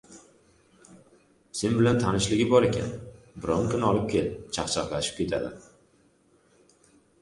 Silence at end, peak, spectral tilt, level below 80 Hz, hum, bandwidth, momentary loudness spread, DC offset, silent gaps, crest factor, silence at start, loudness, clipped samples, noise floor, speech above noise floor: 1.6 s; -6 dBFS; -5 dB/octave; -50 dBFS; none; 11.5 kHz; 15 LU; under 0.1%; none; 22 dB; 0.1 s; -26 LUFS; under 0.1%; -63 dBFS; 38 dB